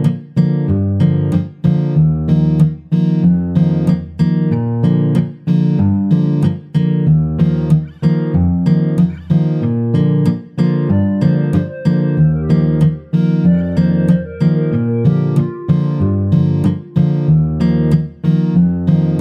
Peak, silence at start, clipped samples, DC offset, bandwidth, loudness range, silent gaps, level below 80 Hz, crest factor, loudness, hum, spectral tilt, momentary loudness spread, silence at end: -2 dBFS; 0 s; under 0.1%; under 0.1%; 5.2 kHz; 1 LU; none; -36 dBFS; 12 dB; -14 LUFS; none; -10.5 dB/octave; 3 LU; 0 s